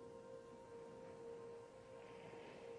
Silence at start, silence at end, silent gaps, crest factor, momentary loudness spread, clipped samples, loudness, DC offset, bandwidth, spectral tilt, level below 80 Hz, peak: 0 s; 0 s; none; 12 dB; 3 LU; under 0.1%; -57 LUFS; under 0.1%; 10 kHz; -5.5 dB/octave; -80 dBFS; -44 dBFS